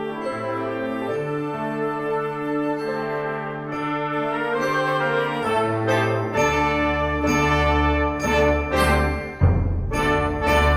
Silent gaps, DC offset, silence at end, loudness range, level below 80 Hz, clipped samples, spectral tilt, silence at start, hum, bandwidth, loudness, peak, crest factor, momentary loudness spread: none; under 0.1%; 0 s; 6 LU; -32 dBFS; under 0.1%; -6 dB/octave; 0 s; none; 15.5 kHz; -22 LUFS; -4 dBFS; 16 dB; 7 LU